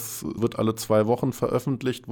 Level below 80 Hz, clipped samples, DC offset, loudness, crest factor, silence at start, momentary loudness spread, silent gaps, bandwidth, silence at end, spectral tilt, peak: -56 dBFS; under 0.1%; under 0.1%; -25 LUFS; 14 dB; 0 s; 6 LU; none; over 20 kHz; 0 s; -6 dB/octave; -10 dBFS